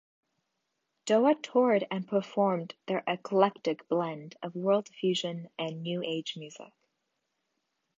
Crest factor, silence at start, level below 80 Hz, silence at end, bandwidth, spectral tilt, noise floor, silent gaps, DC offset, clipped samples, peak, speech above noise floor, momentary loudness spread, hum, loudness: 22 dB; 1.05 s; -84 dBFS; 1.35 s; 8.4 kHz; -5.5 dB/octave; -82 dBFS; none; under 0.1%; under 0.1%; -8 dBFS; 52 dB; 14 LU; none; -30 LUFS